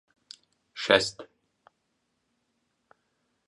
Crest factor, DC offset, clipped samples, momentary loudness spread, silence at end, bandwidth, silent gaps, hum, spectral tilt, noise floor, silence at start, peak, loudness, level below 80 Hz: 30 dB; under 0.1%; under 0.1%; 27 LU; 2.25 s; 11.5 kHz; none; none; -2.5 dB/octave; -77 dBFS; 0.75 s; -2 dBFS; -25 LUFS; -68 dBFS